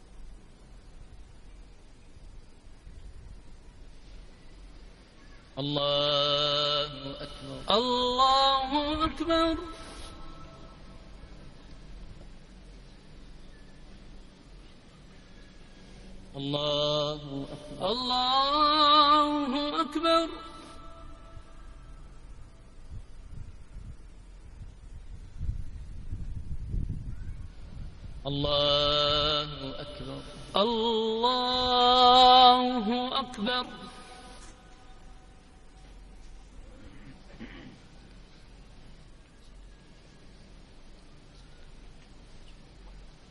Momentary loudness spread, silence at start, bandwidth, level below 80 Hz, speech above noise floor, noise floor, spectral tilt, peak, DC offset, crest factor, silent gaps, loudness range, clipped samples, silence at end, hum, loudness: 28 LU; 0 s; 11.5 kHz; -46 dBFS; 26 dB; -52 dBFS; -4.5 dB/octave; -6 dBFS; under 0.1%; 26 dB; none; 21 LU; under 0.1%; 0.2 s; none; -25 LUFS